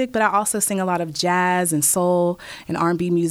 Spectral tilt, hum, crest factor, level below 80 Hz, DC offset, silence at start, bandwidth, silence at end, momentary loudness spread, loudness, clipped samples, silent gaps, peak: -4 dB/octave; none; 16 dB; -58 dBFS; under 0.1%; 0 s; 16.5 kHz; 0 s; 6 LU; -20 LUFS; under 0.1%; none; -4 dBFS